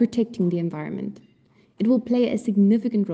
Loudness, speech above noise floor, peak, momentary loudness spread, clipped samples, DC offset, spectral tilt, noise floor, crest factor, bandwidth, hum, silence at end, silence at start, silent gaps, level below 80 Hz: -23 LUFS; 37 dB; -8 dBFS; 12 LU; under 0.1%; under 0.1%; -8.5 dB/octave; -59 dBFS; 14 dB; 8.8 kHz; none; 0 s; 0 s; none; -66 dBFS